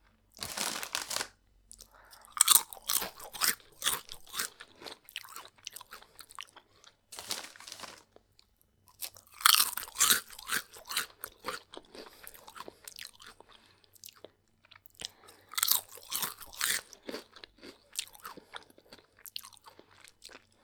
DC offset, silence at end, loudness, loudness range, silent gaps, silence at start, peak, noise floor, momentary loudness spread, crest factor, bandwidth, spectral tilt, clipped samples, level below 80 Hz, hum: under 0.1%; 0.25 s; -30 LUFS; 17 LU; none; 0.35 s; 0 dBFS; -68 dBFS; 25 LU; 36 dB; over 20 kHz; 1.5 dB/octave; under 0.1%; -70 dBFS; none